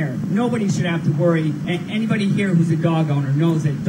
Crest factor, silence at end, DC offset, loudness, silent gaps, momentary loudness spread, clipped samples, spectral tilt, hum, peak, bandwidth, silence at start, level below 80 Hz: 14 dB; 0 s; under 0.1%; -19 LUFS; none; 4 LU; under 0.1%; -7.5 dB/octave; none; -4 dBFS; 10 kHz; 0 s; -58 dBFS